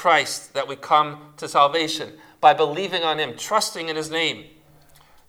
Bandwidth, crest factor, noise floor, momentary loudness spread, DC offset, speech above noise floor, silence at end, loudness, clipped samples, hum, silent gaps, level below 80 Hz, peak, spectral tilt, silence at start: 17.5 kHz; 20 dB; -52 dBFS; 11 LU; under 0.1%; 30 dB; 0.85 s; -21 LUFS; under 0.1%; none; none; -66 dBFS; -2 dBFS; -2.5 dB/octave; 0 s